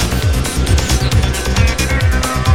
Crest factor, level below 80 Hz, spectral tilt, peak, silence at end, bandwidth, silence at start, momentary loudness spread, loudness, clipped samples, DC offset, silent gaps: 12 dB; -18 dBFS; -4.5 dB/octave; 0 dBFS; 0 s; 16.5 kHz; 0 s; 2 LU; -15 LUFS; under 0.1%; 2%; none